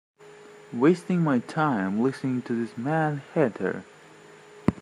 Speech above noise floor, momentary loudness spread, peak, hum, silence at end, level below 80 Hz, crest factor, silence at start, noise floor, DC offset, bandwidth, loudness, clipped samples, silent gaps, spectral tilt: 25 dB; 8 LU; -6 dBFS; none; 0 s; -58 dBFS; 20 dB; 0.2 s; -50 dBFS; under 0.1%; 11.5 kHz; -26 LUFS; under 0.1%; none; -8 dB/octave